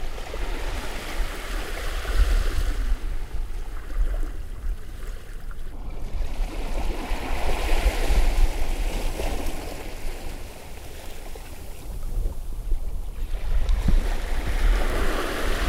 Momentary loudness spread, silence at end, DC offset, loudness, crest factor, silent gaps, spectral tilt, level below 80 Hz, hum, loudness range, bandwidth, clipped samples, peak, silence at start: 14 LU; 0 s; under 0.1%; -31 LUFS; 16 dB; none; -4.5 dB/octave; -24 dBFS; none; 8 LU; 15.5 kHz; under 0.1%; -8 dBFS; 0 s